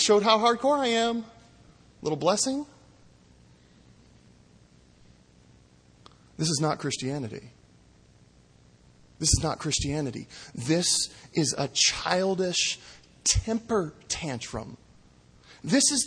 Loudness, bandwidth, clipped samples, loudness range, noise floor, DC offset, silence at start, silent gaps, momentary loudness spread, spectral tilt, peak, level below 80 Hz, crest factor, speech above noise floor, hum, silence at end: -26 LUFS; 10.5 kHz; under 0.1%; 8 LU; -57 dBFS; under 0.1%; 0 s; none; 15 LU; -3 dB/octave; -6 dBFS; -46 dBFS; 22 dB; 31 dB; none; 0 s